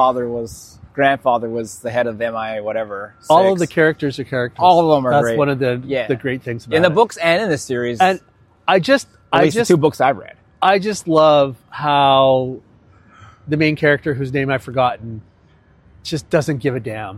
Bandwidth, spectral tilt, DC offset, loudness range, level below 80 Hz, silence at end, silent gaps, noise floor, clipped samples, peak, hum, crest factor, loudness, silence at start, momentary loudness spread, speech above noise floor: 15 kHz; -5.5 dB/octave; under 0.1%; 5 LU; -52 dBFS; 0 s; none; -51 dBFS; under 0.1%; 0 dBFS; none; 18 dB; -17 LUFS; 0 s; 13 LU; 35 dB